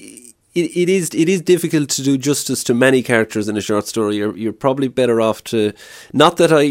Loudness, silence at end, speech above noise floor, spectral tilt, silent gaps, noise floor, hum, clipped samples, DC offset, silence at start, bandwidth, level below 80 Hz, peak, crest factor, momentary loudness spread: -16 LUFS; 0 s; 25 dB; -4.5 dB/octave; none; -41 dBFS; none; under 0.1%; under 0.1%; 0 s; 16.5 kHz; -58 dBFS; 0 dBFS; 16 dB; 8 LU